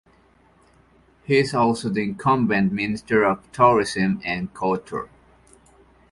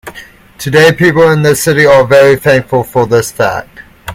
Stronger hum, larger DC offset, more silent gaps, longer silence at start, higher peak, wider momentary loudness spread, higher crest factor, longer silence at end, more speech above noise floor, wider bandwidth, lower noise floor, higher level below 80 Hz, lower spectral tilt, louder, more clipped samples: neither; neither; neither; first, 1.3 s vs 0.05 s; about the same, -2 dBFS vs 0 dBFS; second, 10 LU vs 13 LU; first, 20 dB vs 8 dB; first, 1.05 s vs 0 s; first, 36 dB vs 26 dB; second, 11.5 kHz vs 17 kHz; first, -57 dBFS vs -34 dBFS; second, -54 dBFS vs -40 dBFS; about the same, -6 dB/octave vs -5 dB/octave; second, -21 LUFS vs -8 LUFS; second, under 0.1% vs 1%